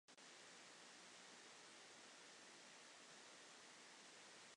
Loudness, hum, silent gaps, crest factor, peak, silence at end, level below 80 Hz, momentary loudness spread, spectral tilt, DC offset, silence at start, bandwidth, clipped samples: -61 LUFS; none; none; 14 dB; -50 dBFS; 0 s; under -90 dBFS; 1 LU; -0.5 dB/octave; under 0.1%; 0.1 s; 11 kHz; under 0.1%